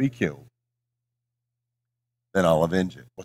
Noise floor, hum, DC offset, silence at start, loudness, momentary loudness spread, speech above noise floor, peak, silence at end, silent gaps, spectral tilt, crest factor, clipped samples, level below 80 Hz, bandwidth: -83 dBFS; 60 Hz at -60 dBFS; under 0.1%; 0 s; -24 LUFS; 8 LU; 60 dB; -6 dBFS; 0 s; none; -6.5 dB/octave; 22 dB; under 0.1%; -56 dBFS; 15 kHz